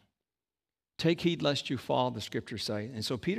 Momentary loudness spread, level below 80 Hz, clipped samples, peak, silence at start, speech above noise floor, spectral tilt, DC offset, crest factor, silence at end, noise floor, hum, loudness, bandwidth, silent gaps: 8 LU; -66 dBFS; under 0.1%; -14 dBFS; 1 s; over 58 dB; -5.5 dB/octave; under 0.1%; 20 dB; 0 s; under -90 dBFS; none; -32 LUFS; 15.5 kHz; none